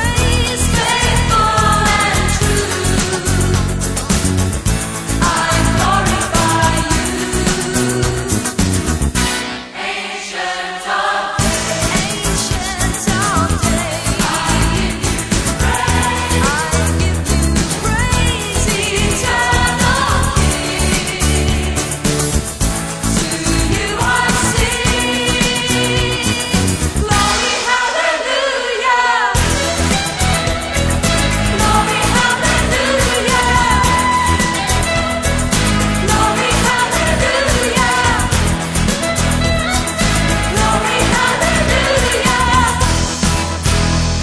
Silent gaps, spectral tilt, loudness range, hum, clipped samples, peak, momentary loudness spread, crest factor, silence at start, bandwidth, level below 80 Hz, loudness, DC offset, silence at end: none; -3.5 dB/octave; 3 LU; none; under 0.1%; 0 dBFS; 4 LU; 14 dB; 0 s; 11 kHz; -22 dBFS; -14 LUFS; under 0.1%; 0 s